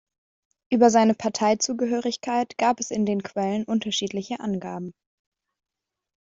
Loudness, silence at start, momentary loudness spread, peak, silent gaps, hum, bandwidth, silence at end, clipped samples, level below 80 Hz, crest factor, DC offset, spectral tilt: -24 LUFS; 0.7 s; 11 LU; -4 dBFS; none; none; 7.8 kHz; 1.3 s; under 0.1%; -66 dBFS; 20 dB; under 0.1%; -4 dB/octave